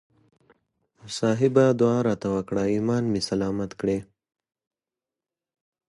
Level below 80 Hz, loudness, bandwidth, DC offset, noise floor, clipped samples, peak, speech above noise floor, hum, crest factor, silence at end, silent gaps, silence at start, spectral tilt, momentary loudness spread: -56 dBFS; -24 LUFS; 11.5 kHz; under 0.1%; -90 dBFS; under 0.1%; -6 dBFS; 67 dB; none; 20 dB; 1.85 s; none; 1.05 s; -6.5 dB/octave; 9 LU